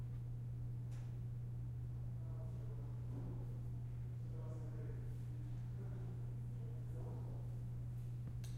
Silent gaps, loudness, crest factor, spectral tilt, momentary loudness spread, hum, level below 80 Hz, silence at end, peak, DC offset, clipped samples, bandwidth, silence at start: none; -48 LUFS; 10 dB; -8.5 dB/octave; 1 LU; none; -56 dBFS; 0 s; -36 dBFS; under 0.1%; under 0.1%; 8.8 kHz; 0 s